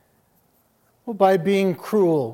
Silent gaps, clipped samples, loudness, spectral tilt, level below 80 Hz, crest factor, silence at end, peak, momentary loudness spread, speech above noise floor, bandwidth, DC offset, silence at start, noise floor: none; under 0.1%; -20 LUFS; -7 dB/octave; -72 dBFS; 18 dB; 0 s; -4 dBFS; 14 LU; 44 dB; 16.5 kHz; under 0.1%; 1.05 s; -63 dBFS